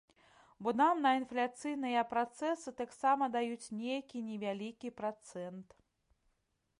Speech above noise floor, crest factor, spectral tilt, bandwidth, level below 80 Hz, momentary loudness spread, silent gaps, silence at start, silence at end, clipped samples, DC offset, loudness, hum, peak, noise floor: 45 dB; 18 dB; -4.5 dB/octave; 11.5 kHz; -80 dBFS; 13 LU; none; 0.6 s; 1.15 s; under 0.1%; under 0.1%; -36 LUFS; none; -20 dBFS; -81 dBFS